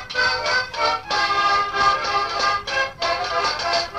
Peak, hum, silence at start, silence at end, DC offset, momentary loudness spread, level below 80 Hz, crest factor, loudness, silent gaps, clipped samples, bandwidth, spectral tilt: -6 dBFS; none; 0 s; 0 s; under 0.1%; 4 LU; -48 dBFS; 16 dB; -20 LUFS; none; under 0.1%; 13.5 kHz; -1.5 dB/octave